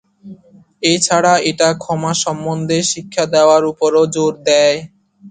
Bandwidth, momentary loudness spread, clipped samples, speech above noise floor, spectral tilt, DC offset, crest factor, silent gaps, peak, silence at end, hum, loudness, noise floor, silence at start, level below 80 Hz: 9.6 kHz; 7 LU; under 0.1%; 30 dB; -3.5 dB/octave; under 0.1%; 16 dB; none; 0 dBFS; 0 s; none; -14 LUFS; -44 dBFS; 0.25 s; -56 dBFS